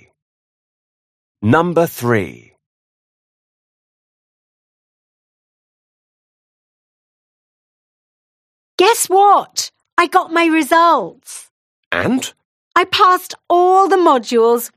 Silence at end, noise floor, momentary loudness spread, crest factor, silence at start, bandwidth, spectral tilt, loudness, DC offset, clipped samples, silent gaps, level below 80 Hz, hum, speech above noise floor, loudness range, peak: 0.1 s; under -90 dBFS; 12 LU; 18 dB; 1.4 s; 15.5 kHz; -4 dB/octave; -14 LUFS; under 0.1%; under 0.1%; 2.66-8.78 s, 9.92-9.97 s, 11.51-11.91 s, 12.45-12.71 s; -60 dBFS; none; over 76 dB; 8 LU; 0 dBFS